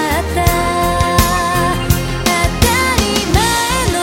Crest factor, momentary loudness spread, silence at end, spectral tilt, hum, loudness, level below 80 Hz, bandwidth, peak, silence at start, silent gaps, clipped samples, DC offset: 14 dB; 3 LU; 0 s; -4 dB/octave; none; -14 LUFS; -22 dBFS; 17 kHz; 0 dBFS; 0 s; none; under 0.1%; under 0.1%